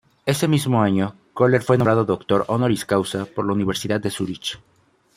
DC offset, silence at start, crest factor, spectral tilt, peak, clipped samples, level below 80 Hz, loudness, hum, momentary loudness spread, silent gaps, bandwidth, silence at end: under 0.1%; 0.25 s; 18 dB; -6 dB/octave; -2 dBFS; under 0.1%; -54 dBFS; -21 LUFS; none; 9 LU; none; 16 kHz; 0.6 s